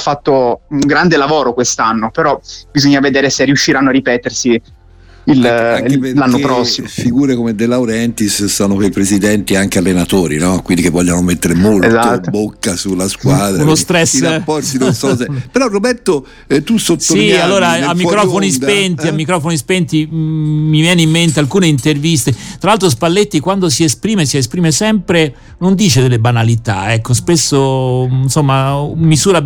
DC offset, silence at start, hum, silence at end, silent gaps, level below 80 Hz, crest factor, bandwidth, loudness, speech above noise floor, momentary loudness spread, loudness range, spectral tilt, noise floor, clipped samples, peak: under 0.1%; 0 s; none; 0 s; none; -38 dBFS; 12 dB; 19 kHz; -12 LUFS; 28 dB; 5 LU; 1 LU; -4.5 dB/octave; -39 dBFS; under 0.1%; 0 dBFS